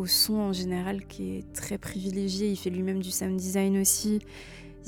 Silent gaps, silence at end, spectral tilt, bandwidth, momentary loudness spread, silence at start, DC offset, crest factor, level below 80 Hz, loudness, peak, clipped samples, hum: none; 0 s; -4 dB/octave; 19 kHz; 13 LU; 0 s; under 0.1%; 20 dB; -52 dBFS; -28 LUFS; -10 dBFS; under 0.1%; none